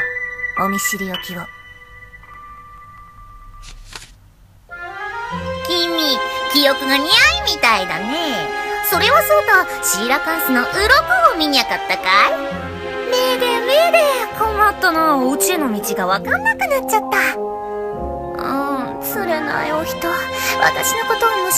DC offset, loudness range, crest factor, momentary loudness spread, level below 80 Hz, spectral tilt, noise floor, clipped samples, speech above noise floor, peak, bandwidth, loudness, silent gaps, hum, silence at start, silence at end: under 0.1%; 11 LU; 18 dB; 13 LU; -42 dBFS; -2 dB/octave; -47 dBFS; under 0.1%; 31 dB; 0 dBFS; 15.5 kHz; -16 LUFS; none; none; 0 s; 0 s